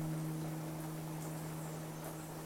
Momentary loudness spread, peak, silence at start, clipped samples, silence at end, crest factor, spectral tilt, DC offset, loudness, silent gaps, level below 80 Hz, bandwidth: 4 LU; -30 dBFS; 0 s; under 0.1%; 0 s; 12 dB; -6 dB/octave; under 0.1%; -43 LUFS; none; -66 dBFS; 16.5 kHz